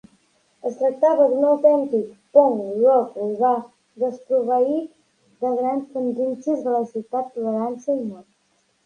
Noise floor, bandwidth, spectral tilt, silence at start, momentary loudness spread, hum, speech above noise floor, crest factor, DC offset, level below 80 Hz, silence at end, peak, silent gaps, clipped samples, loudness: -66 dBFS; 9.2 kHz; -8 dB/octave; 0.65 s; 10 LU; none; 45 dB; 20 dB; under 0.1%; -74 dBFS; 0.65 s; -2 dBFS; none; under 0.1%; -21 LUFS